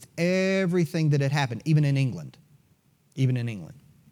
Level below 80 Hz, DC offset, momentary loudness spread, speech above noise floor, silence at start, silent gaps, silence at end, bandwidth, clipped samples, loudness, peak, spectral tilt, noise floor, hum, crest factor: -70 dBFS; under 0.1%; 17 LU; 39 dB; 0 s; none; 0.4 s; 13.5 kHz; under 0.1%; -25 LUFS; -10 dBFS; -7 dB/octave; -64 dBFS; none; 14 dB